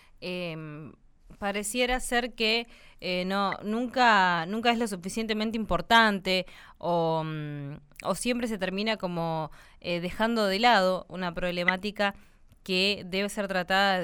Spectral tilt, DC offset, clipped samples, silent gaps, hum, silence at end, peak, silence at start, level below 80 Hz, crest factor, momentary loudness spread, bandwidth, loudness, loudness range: -4 dB/octave; under 0.1%; under 0.1%; none; none; 0 s; -8 dBFS; 0.2 s; -50 dBFS; 20 dB; 15 LU; 19.5 kHz; -27 LUFS; 5 LU